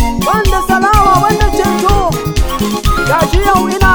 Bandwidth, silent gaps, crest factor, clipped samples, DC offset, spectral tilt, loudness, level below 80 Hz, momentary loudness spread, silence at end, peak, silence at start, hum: over 20 kHz; none; 10 dB; 0.2%; under 0.1%; -5 dB/octave; -11 LUFS; -16 dBFS; 6 LU; 0 s; 0 dBFS; 0 s; none